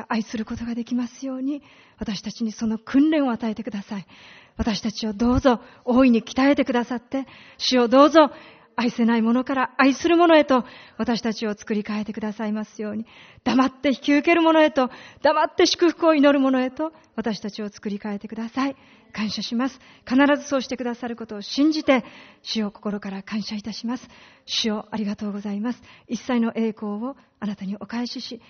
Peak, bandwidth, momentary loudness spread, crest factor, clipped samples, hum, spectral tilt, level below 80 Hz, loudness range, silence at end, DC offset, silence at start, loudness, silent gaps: -2 dBFS; 6.6 kHz; 14 LU; 20 dB; under 0.1%; none; -3.5 dB/octave; -50 dBFS; 9 LU; 0.1 s; under 0.1%; 0 s; -22 LUFS; none